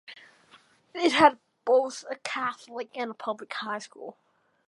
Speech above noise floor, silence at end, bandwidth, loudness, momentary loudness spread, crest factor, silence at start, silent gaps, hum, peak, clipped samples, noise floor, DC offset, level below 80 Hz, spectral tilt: 32 dB; 0.55 s; 11.5 kHz; -27 LUFS; 22 LU; 26 dB; 0.1 s; none; none; -4 dBFS; under 0.1%; -59 dBFS; under 0.1%; -70 dBFS; -3 dB/octave